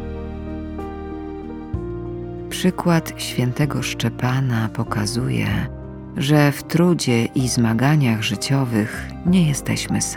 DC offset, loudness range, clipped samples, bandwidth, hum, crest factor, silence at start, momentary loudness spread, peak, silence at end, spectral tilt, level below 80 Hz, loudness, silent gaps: under 0.1%; 5 LU; under 0.1%; 18 kHz; none; 16 dB; 0 s; 14 LU; -4 dBFS; 0 s; -5.5 dB/octave; -38 dBFS; -21 LUFS; none